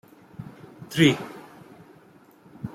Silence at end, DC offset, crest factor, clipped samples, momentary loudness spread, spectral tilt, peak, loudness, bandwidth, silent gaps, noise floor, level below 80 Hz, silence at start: 0.05 s; under 0.1%; 24 dB; under 0.1%; 26 LU; -5.5 dB/octave; -6 dBFS; -22 LUFS; 16 kHz; none; -54 dBFS; -62 dBFS; 0.4 s